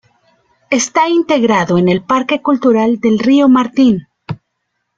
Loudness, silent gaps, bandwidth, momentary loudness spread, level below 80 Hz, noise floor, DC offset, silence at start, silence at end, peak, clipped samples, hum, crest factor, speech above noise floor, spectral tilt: -12 LUFS; none; 7.8 kHz; 11 LU; -52 dBFS; -70 dBFS; under 0.1%; 0.7 s; 0.65 s; -2 dBFS; under 0.1%; none; 12 dB; 59 dB; -5 dB/octave